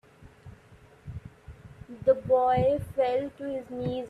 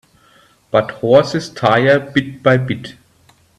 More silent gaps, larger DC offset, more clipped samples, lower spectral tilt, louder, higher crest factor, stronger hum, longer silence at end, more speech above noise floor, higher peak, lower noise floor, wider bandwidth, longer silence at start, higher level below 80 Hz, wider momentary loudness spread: neither; neither; neither; first, -8 dB/octave vs -6.5 dB/octave; second, -27 LUFS vs -15 LUFS; about the same, 18 dB vs 16 dB; neither; second, 0 s vs 0.65 s; second, 29 dB vs 38 dB; second, -12 dBFS vs 0 dBFS; about the same, -55 dBFS vs -52 dBFS; about the same, 11.5 kHz vs 11.5 kHz; second, 0.2 s vs 0.75 s; about the same, -54 dBFS vs -52 dBFS; first, 25 LU vs 10 LU